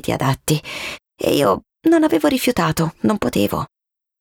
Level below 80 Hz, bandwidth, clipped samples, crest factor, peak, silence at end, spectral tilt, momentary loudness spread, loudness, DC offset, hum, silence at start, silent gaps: -46 dBFS; 19.5 kHz; under 0.1%; 14 dB; -4 dBFS; 0.55 s; -5.5 dB/octave; 11 LU; -19 LUFS; under 0.1%; none; 0.05 s; none